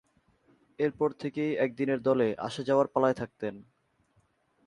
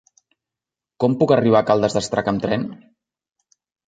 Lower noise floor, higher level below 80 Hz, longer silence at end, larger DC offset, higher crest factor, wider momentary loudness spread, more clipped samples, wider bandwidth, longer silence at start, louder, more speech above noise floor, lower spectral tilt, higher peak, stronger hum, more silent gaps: second, -70 dBFS vs -88 dBFS; second, -68 dBFS vs -54 dBFS; about the same, 1.05 s vs 1.15 s; neither; about the same, 20 dB vs 20 dB; about the same, 8 LU vs 8 LU; neither; first, 11 kHz vs 9.4 kHz; second, 0.8 s vs 1 s; second, -29 LUFS vs -19 LUFS; second, 41 dB vs 70 dB; about the same, -7 dB/octave vs -6 dB/octave; second, -10 dBFS vs -2 dBFS; neither; neither